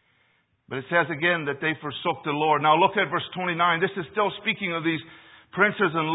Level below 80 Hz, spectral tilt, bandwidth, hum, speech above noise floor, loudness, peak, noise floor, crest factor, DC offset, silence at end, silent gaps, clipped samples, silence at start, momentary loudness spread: -68 dBFS; -9.5 dB/octave; 4 kHz; none; 42 dB; -24 LUFS; -4 dBFS; -67 dBFS; 22 dB; under 0.1%; 0 s; none; under 0.1%; 0.7 s; 9 LU